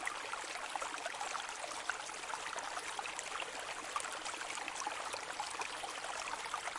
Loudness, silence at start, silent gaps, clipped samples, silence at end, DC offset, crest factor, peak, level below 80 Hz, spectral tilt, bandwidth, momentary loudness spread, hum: -41 LUFS; 0 s; none; under 0.1%; 0 s; under 0.1%; 22 dB; -20 dBFS; -74 dBFS; 0.5 dB/octave; 11.5 kHz; 1 LU; none